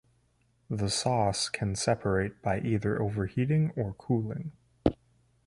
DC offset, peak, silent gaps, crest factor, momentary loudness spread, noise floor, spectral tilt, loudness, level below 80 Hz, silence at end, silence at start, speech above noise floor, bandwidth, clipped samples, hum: under 0.1%; -6 dBFS; none; 24 dB; 7 LU; -69 dBFS; -5.5 dB/octave; -30 LUFS; -50 dBFS; 0.55 s; 0.7 s; 40 dB; 11.5 kHz; under 0.1%; none